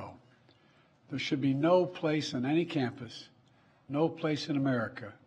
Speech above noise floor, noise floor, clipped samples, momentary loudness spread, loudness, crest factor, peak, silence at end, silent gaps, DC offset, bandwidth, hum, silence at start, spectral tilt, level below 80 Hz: 34 dB; -65 dBFS; under 0.1%; 16 LU; -31 LUFS; 20 dB; -14 dBFS; 0.1 s; none; under 0.1%; 9.2 kHz; none; 0 s; -6.5 dB/octave; -74 dBFS